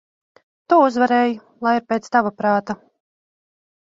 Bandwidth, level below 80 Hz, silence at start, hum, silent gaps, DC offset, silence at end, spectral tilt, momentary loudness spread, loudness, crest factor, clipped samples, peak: 7.8 kHz; -66 dBFS; 0.7 s; none; none; under 0.1%; 1.1 s; -6 dB/octave; 8 LU; -18 LUFS; 18 dB; under 0.1%; -2 dBFS